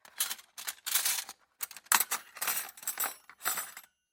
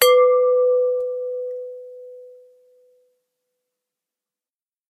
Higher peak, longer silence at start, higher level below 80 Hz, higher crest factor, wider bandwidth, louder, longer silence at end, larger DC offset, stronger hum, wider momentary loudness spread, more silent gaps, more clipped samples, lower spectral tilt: second, -6 dBFS vs 0 dBFS; first, 0.15 s vs 0 s; about the same, -86 dBFS vs -84 dBFS; first, 30 dB vs 22 dB; about the same, 17 kHz vs 15.5 kHz; second, -32 LUFS vs -19 LUFS; second, 0.3 s vs 2.65 s; neither; neither; second, 14 LU vs 25 LU; neither; neither; about the same, 2.5 dB/octave vs 2 dB/octave